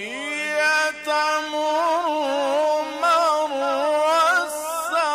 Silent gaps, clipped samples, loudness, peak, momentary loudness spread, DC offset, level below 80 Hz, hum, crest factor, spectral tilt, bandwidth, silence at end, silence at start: none; under 0.1%; -21 LUFS; -10 dBFS; 6 LU; under 0.1%; -66 dBFS; 50 Hz at -65 dBFS; 12 dB; -0.5 dB/octave; 16 kHz; 0 s; 0 s